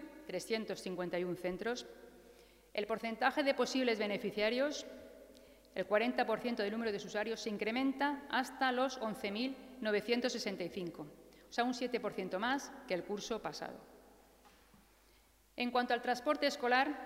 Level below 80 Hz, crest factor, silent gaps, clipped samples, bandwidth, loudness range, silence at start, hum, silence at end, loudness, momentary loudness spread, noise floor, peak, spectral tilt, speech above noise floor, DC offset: -70 dBFS; 22 dB; none; under 0.1%; 16 kHz; 5 LU; 0 s; none; 0 s; -37 LUFS; 11 LU; -67 dBFS; -16 dBFS; -4 dB/octave; 31 dB; under 0.1%